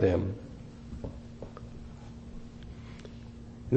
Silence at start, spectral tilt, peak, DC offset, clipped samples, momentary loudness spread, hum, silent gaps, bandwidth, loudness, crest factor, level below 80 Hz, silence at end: 0 s; -8.5 dB/octave; -8 dBFS; under 0.1%; under 0.1%; 12 LU; none; none; 8.4 kHz; -40 LUFS; 26 dB; -48 dBFS; 0 s